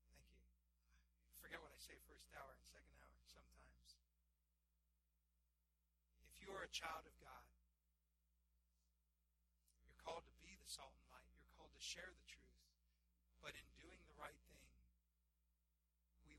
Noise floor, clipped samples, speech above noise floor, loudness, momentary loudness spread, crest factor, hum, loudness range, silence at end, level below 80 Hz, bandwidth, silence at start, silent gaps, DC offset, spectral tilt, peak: -87 dBFS; under 0.1%; 30 dB; -58 LUFS; 17 LU; 28 dB; none; 7 LU; 0 s; -76 dBFS; 16 kHz; 0 s; none; under 0.1%; -1.5 dB/octave; -36 dBFS